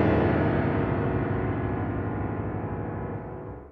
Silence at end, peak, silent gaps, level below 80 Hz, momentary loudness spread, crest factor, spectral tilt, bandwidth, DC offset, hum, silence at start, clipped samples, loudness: 0 s; -12 dBFS; none; -40 dBFS; 11 LU; 16 dB; -10.5 dB/octave; 5.2 kHz; under 0.1%; none; 0 s; under 0.1%; -28 LUFS